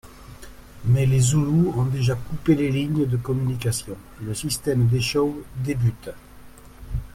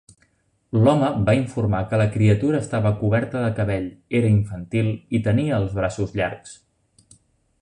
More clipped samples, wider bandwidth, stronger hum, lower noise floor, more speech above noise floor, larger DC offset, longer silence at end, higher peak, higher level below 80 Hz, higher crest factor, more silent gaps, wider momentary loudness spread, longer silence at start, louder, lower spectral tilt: neither; first, 15.5 kHz vs 10 kHz; neither; second, -44 dBFS vs -64 dBFS; second, 22 dB vs 44 dB; neither; second, 0.05 s vs 1.1 s; about the same, -6 dBFS vs -4 dBFS; about the same, -42 dBFS vs -44 dBFS; about the same, 16 dB vs 16 dB; neither; first, 15 LU vs 7 LU; second, 0.05 s vs 0.75 s; about the same, -22 LUFS vs -21 LUFS; second, -6 dB/octave vs -8 dB/octave